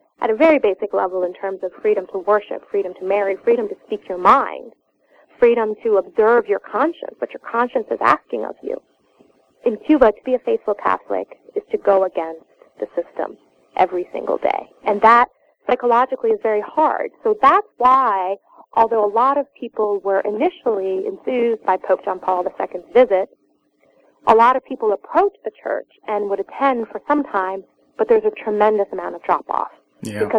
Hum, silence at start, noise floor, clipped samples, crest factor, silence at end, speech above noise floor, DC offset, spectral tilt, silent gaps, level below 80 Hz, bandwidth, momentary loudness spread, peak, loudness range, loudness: none; 0.2 s; -61 dBFS; under 0.1%; 18 dB; 0 s; 43 dB; under 0.1%; -6 dB/octave; none; -56 dBFS; 10.5 kHz; 13 LU; 0 dBFS; 4 LU; -19 LUFS